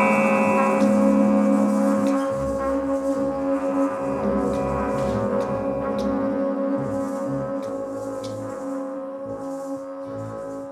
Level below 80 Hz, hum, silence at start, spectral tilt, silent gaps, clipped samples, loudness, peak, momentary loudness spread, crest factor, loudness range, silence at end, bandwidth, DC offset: -46 dBFS; none; 0 s; -7 dB/octave; none; under 0.1%; -23 LUFS; -6 dBFS; 13 LU; 16 dB; 9 LU; 0 s; 13 kHz; under 0.1%